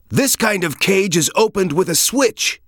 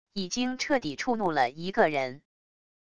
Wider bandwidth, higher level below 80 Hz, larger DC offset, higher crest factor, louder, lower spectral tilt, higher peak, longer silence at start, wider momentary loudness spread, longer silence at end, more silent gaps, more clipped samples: first, over 20 kHz vs 11 kHz; first, -52 dBFS vs -62 dBFS; second, under 0.1% vs 0.4%; second, 14 dB vs 20 dB; first, -15 LUFS vs -28 LUFS; about the same, -3 dB/octave vs -4 dB/octave; first, -2 dBFS vs -10 dBFS; about the same, 0.1 s vs 0.05 s; second, 3 LU vs 6 LU; second, 0.1 s vs 0.7 s; neither; neither